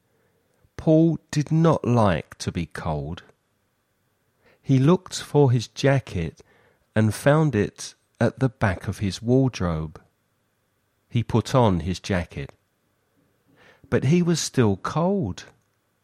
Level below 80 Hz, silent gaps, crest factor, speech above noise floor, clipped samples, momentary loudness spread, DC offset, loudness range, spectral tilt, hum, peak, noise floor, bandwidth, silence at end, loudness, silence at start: -48 dBFS; none; 18 dB; 48 dB; under 0.1%; 12 LU; under 0.1%; 4 LU; -6.5 dB/octave; none; -4 dBFS; -70 dBFS; 14.5 kHz; 0.6 s; -23 LUFS; 0.8 s